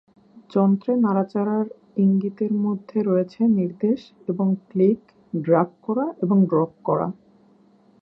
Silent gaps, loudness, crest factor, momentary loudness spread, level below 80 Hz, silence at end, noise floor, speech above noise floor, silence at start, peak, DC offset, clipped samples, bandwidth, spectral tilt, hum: none; -22 LUFS; 16 dB; 7 LU; -68 dBFS; 0.9 s; -56 dBFS; 35 dB; 0.5 s; -6 dBFS; under 0.1%; under 0.1%; 5.6 kHz; -11.5 dB/octave; none